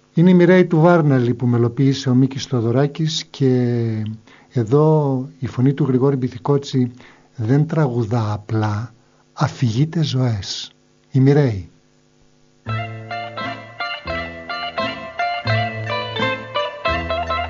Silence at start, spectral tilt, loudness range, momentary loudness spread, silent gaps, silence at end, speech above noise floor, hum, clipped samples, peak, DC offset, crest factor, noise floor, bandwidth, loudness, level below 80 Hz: 0.15 s; -6.5 dB/octave; 7 LU; 14 LU; none; 0 s; 38 dB; none; under 0.1%; 0 dBFS; under 0.1%; 18 dB; -55 dBFS; 7.4 kHz; -19 LUFS; -46 dBFS